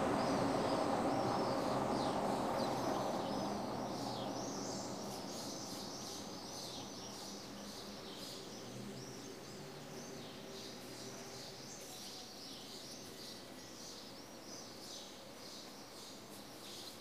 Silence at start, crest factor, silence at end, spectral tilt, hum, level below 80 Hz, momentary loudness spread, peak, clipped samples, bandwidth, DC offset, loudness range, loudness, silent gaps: 0 s; 20 dB; 0 s; -4 dB/octave; none; -70 dBFS; 14 LU; -22 dBFS; under 0.1%; 15.5 kHz; under 0.1%; 12 LU; -43 LUFS; none